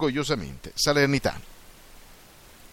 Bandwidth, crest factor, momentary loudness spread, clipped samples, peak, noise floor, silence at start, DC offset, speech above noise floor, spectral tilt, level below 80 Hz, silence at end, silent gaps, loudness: 17 kHz; 20 dB; 12 LU; under 0.1%; -8 dBFS; -50 dBFS; 0 s; under 0.1%; 25 dB; -4 dB/octave; -46 dBFS; 0.05 s; none; -25 LUFS